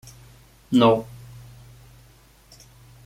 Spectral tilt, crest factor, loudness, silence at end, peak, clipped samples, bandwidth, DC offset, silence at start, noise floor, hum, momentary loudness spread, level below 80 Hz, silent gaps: -6.5 dB/octave; 22 dB; -20 LUFS; 2 s; -4 dBFS; under 0.1%; 15.5 kHz; under 0.1%; 0.7 s; -53 dBFS; none; 27 LU; -54 dBFS; none